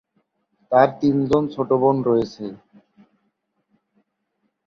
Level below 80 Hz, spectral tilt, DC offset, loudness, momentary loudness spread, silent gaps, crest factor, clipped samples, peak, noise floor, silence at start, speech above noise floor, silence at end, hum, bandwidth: -58 dBFS; -8.5 dB/octave; under 0.1%; -19 LUFS; 12 LU; none; 20 dB; under 0.1%; -2 dBFS; -73 dBFS; 0.7 s; 54 dB; 2.1 s; none; 7.2 kHz